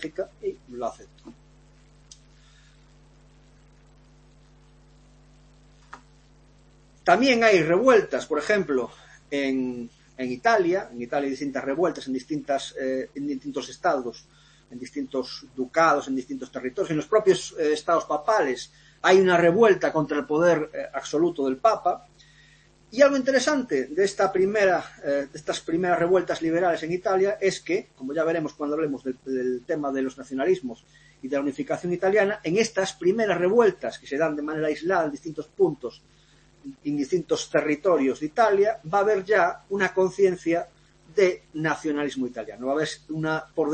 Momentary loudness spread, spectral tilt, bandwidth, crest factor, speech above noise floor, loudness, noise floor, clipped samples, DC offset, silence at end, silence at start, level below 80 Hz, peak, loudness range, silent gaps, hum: 13 LU; -5 dB/octave; 8.8 kHz; 20 dB; 33 dB; -24 LUFS; -57 dBFS; under 0.1%; under 0.1%; 0 s; 0 s; -60 dBFS; -4 dBFS; 7 LU; none; none